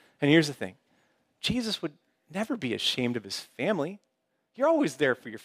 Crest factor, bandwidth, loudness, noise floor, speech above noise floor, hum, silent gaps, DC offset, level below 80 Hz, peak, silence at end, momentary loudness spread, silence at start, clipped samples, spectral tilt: 22 dB; 15.5 kHz; -28 LUFS; -73 dBFS; 45 dB; none; none; under 0.1%; -62 dBFS; -8 dBFS; 0.05 s; 14 LU; 0.2 s; under 0.1%; -5 dB/octave